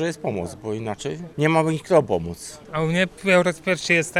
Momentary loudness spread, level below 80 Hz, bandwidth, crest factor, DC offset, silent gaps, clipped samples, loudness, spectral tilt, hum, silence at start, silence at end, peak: 12 LU; -52 dBFS; 14.5 kHz; 20 dB; under 0.1%; none; under 0.1%; -22 LUFS; -5 dB/octave; none; 0 s; 0 s; -2 dBFS